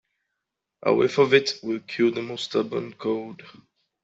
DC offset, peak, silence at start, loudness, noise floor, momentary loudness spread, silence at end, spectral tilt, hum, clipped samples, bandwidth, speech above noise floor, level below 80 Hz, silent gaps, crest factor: under 0.1%; -4 dBFS; 0.85 s; -24 LUFS; -83 dBFS; 11 LU; 0.55 s; -5 dB/octave; none; under 0.1%; 8 kHz; 59 dB; -68 dBFS; none; 22 dB